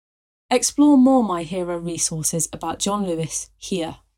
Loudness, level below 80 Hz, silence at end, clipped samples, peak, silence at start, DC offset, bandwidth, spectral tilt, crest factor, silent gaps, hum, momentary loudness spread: -20 LUFS; -52 dBFS; 0.2 s; under 0.1%; -6 dBFS; 0.5 s; under 0.1%; 16.5 kHz; -4 dB/octave; 14 dB; none; none; 12 LU